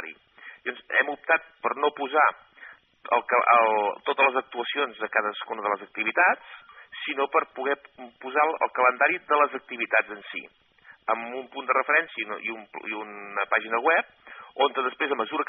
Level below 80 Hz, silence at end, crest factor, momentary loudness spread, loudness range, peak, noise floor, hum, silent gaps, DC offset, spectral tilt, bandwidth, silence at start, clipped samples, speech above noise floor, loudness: -80 dBFS; 0.05 s; 20 dB; 14 LU; 4 LU; -6 dBFS; -50 dBFS; none; none; under 0.1%; 1 dB/octave; 4 kHz; 0 s; under 0.1%; 24 dB; -25 LUFS